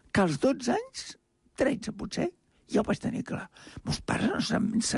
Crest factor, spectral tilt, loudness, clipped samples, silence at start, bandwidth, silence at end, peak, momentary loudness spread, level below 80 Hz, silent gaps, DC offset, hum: 18 dB; -5 dB/octave; -30 LUFS; under 0.1%; 0.15 s; 11.5 kHz; 0 s; -12 dBFS; 13 LU; -52 dBFS; none; under 0.1%; none